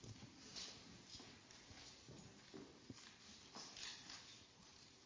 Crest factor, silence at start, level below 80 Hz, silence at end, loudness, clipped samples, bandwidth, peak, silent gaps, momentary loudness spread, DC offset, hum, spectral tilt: 24 dB; 0 s; -78 dBFS; 0 s; -57 LUFS; under 0.1%; 8 kHz; -34 dBFS; none; 9 LU; under 0.1%; none; -2.5 dB/octave